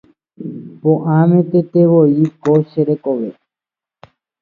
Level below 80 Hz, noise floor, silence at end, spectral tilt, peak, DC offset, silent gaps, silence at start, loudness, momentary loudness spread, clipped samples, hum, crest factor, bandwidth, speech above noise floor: -64 dBFS; -88 dBFS; 1.1 s; -11 dB/octave; 0 dBFS; under 0.1%; none; 0.4 s; -14 LUFS; 18 LU; under 0.1%; none; 14 dB; 4.7 kHz; 76 dB